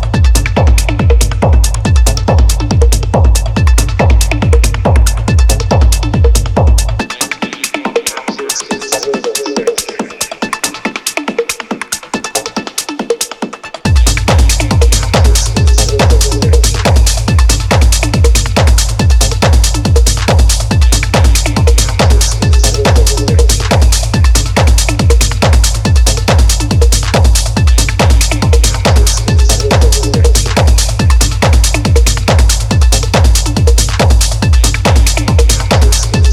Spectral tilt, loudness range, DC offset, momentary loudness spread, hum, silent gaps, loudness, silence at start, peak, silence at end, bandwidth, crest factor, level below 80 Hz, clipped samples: -4.5 dB/octave; 6 LU; under 0.1%; 7 LU; none; none; -10 LUFS; 0 s; 0 dBFS; 0 s; 15 kHz; 8 dB; -10 dBFS; under 0.1%